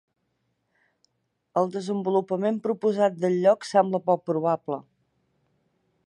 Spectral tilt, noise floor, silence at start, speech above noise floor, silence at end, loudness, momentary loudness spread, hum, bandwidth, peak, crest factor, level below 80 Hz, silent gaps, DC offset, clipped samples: -7 dB/octave; -75 dBFS; 1.55 s; 51 dB; 1.25 s; -25 LUFS; 7 LU; none; 11.5 kHz; -6 dBFS; 20 dB; -78 dBFS; none; under 0.1%; under 0.1%